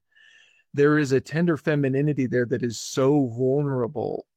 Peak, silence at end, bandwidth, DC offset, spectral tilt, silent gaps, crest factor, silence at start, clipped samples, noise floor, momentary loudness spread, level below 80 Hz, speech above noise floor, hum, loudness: -10 dBFS; 0.15 s; 14 kHz; under 0.1%; -6.5 dB/octave; none; 14 dB; 0.75 s; under 0.1%; -56 dBFS; 7 LU; -64 dBFS; 34 dB; none; -23 LUFS